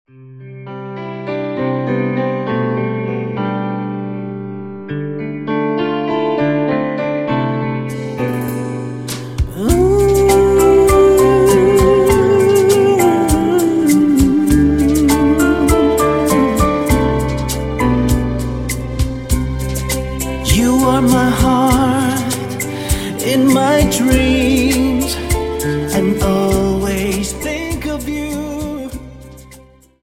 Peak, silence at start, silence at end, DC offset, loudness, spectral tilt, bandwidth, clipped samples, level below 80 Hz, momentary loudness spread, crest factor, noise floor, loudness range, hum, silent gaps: 0 dBFS; 0.2 s; 0.45 s; under 0.1%; -15 LUFS; -5.5 dB/octave; 16.5 kHz; under 0.1%; -26 dBFS; 13 LU; 14 dB; -43 dBFS; 9 LU; none; none